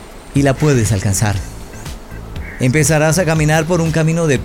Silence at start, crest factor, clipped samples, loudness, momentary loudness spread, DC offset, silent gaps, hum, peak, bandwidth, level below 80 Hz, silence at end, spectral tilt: 0 s; 14 dB; under 0.1%; -14 LUFS; 18 LU; under 0.1%; none; none; -2 dBFS; 16.5 kHz; -32 dBFS; 0 s; -5.5 dB/octave